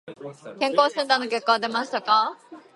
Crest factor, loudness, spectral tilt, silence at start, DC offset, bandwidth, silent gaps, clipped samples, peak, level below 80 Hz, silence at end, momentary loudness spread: 20 dB; -22 LUFS; -3 dB/octave; 0.05 s; under 0.1%; 11.5 kHz; none; under 0.1%; -4 dBFS; -80 dBFS; 0.15 s; 16 LU